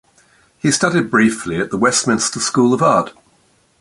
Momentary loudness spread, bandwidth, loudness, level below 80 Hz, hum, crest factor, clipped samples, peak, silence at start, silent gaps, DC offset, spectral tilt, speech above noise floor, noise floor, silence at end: 7 LU; 11.5 kHz; -15 LUFS; -52 dBFS; none; 16 dB; under 0.1%; -2 dBFS; 0.65 s; none; under 0.1%; -4 dB/octave; 41 dB; -57 dBFS; 0.7 s